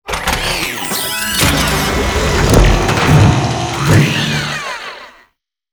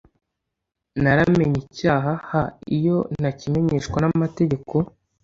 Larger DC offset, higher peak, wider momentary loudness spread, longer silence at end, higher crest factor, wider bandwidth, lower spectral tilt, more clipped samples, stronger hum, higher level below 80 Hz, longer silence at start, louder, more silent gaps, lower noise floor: neither; first, 0 dBFS vs -4 dBFS; about the same, 9 LU vs 7 LU; first, 0.6 s vs 0.4 s; about the same, 14 dB vs 18 dB; first, over 20 kHz vs 7.6 kHz; second, -4.5 dB/octave vs -8 dB/octave; first, 0.1% vs under 0.1%; neither; first, -22 dBFS vs -46 dBFS; second, 0.05 s vs 0.95 s; first, -13 LUFS vs -22 LUFS; neither; second, -58 dBFS vs -80 dBFS